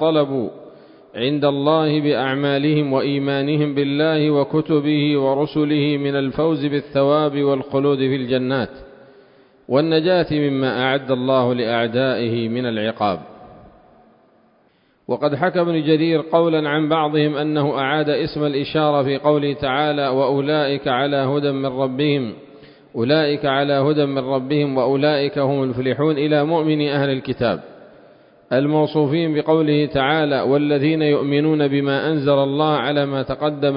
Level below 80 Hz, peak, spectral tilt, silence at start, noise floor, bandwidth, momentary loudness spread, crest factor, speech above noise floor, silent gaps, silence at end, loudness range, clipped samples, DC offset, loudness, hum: -54 dBFS; -2 dBFS; -11.5 dB/octave; 0 s; -58 dBFS; 5.4 kHz; 5 LU; 16 dB; 40 dB; none; 0 s; 3 LU; under 0.1%; under 0.1%; -19 LUFS; none